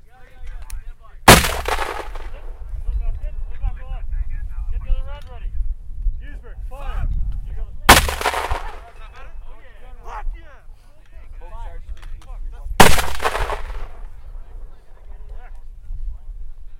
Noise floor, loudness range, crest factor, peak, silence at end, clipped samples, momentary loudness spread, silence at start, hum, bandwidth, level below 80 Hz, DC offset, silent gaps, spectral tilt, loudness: -39 dBFS; 19 LU; 20 dB; 0 dBFS; 0 s; 0.1%; 29 LU; 0.2 s; none; 16 kHz; -26 dBFS; under 0.1%; none; -3 dB/octave; -18 LUFS